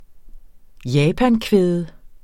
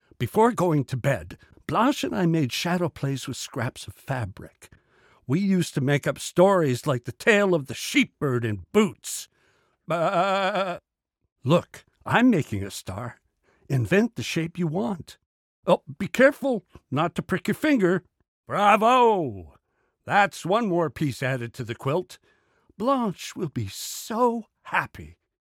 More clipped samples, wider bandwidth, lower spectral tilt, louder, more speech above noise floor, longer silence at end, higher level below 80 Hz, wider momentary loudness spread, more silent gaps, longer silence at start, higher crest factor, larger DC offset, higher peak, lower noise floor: neither; about the same, 16 kHz vs 17.5 kHz; first, -7 dB/octave vs -5.5 dB/octave; first, -18 LUFS vs -24 LUFS; second, 22 dB vs 46 dB; second, 0.1 s vs 0.35 s; first, -40 dBFS vs -60 dBFS; about the same, 15 LU vs 14 LU; second, none vs 11.32-11.36 s, 15.26-15.63 s, 18.28-18.43 s; second, 0 s vs 0.2 s; about the same, 18 dB vs 20 dB; neither; about the same, -2 dBFS vs -4 dBFS; second, -39 dBFS vs -70 dBFS